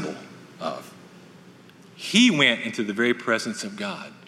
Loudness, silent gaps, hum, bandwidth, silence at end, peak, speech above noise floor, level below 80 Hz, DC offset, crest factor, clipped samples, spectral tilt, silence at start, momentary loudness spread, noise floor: -22 LUFS; none; none; 13.5 kHz; 0 s; -4 dBFS; 26 dB; -76 dBFS; under 0.1%; 22 dB; under 0.1%; -3.5 dB/octave; 0 s; 18 LU; -49 dBFS